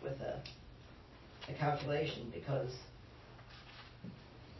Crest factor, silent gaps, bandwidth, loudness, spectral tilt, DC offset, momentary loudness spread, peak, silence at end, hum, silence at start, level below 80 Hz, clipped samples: 20 dB; none; 6 kHz; -41 LUFS; -5 dB/octave; under 0.1%; 20 LU; -24 dBFS; 0 s; none; 0 s; -62 dBFS; under 0.1%